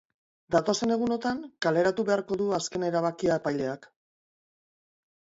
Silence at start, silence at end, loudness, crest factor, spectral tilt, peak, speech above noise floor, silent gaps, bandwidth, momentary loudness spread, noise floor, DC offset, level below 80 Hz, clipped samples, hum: 0.5 s; 1.55 s; -28 LUFS; 18 dB; -5 dB/octave; -10 dBFS; over 63 dB; none; 8 kHz; 6 LU; under -90 dBFS; under 0.1%; -64 dBFS; under 0.1%; none